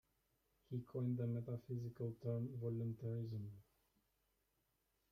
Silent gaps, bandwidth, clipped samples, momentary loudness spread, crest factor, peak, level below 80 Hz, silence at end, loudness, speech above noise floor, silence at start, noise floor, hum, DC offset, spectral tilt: none; 14.5 kHz; under 0.1%; 8 LU; 16 dB; -30 dBFS; -78 dBFS; 1.5 s; -46 LUFS; 40 dB; 0.7 s; -85 dBFS; none; under 0.1%; -10.5 dB/octave